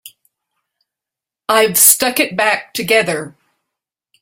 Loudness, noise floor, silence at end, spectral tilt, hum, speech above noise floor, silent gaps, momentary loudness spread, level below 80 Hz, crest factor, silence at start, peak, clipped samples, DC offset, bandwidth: -12 LUFS; -86 dBFS; 0.9 s; -1.5 dB/octave; none; 72 dB; none; 15 LU; -60 dBFS; 18 dB; 0.05 s; 0 dBFS; under 0.1%; under 0.1%; 17 kHz